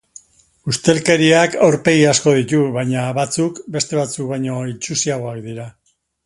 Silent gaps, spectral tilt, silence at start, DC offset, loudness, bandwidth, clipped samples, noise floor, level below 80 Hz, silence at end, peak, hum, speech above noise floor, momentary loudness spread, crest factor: none; -4.5 dB/octave; 0.65 s; under 0.1%; -16 LUFS; 11.5 kHz; under 0.1%; -51 dBFS; -54 dBFS; 0.55 s; 0 dBFS; none; 35 dB; 14 LU; 18 dB